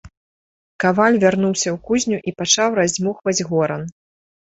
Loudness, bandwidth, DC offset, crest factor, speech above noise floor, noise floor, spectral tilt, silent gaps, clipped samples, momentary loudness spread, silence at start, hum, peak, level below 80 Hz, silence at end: -18 LUFS; 8.2 kHz; under 0.1%; 18 dB; over 72 dB; under -90 dBFS; -3.5 dB/octave; 0.17-0.79 s; under 0.1%; 8 LU; 0.05 s; none; -2 dBFS; -54 dBFS; 0.7 s